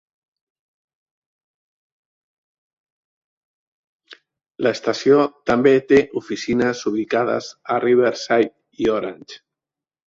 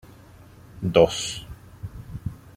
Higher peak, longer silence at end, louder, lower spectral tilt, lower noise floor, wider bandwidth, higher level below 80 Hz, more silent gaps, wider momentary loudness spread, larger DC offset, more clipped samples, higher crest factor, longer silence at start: about the same, -2 dBFS vs -2 dBFS; first, 0.7 s vs 0.05 s; first, -19 LUFS vs -23 LUFS; about the same, -5.5 dB/octave vs -5 dB/octave; first, -89 dBFS vs -48 dBFS; second, 7.6 kHz vs 16 kHz; second, -58 dBFS vs -46 dBFS; neither; second, 10 LU vs 21 LU; neither; neither; second, 18 dB vs 24 dB; first, 4.1 s vs 0.75 s